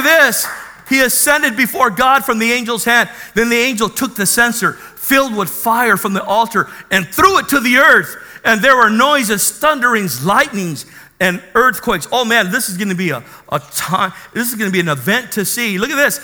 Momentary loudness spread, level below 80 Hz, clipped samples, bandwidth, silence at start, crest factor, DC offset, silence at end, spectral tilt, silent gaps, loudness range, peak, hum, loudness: 9 LU; -46 dBFS; under 0.1%; over 20 kHz; 0 s; 14 dB; under 0.1%; 0 s; -3 dB/octave; none; 5 LU; 0 dBFS; none; -13 LUFS